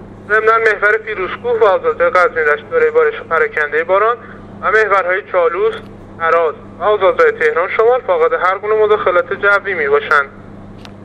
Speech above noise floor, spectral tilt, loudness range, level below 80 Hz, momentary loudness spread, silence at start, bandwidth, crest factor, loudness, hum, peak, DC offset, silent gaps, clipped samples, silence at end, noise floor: 20 dB; -5 dB/octave; 2 LU; -48 dBFS; 7 LU; 0 s; 8.8 kHz; 14 dB; -13 LUFS; none; 0 dBFS; under 0.1%; none; under 0.1%; 0 s; -33 dBFS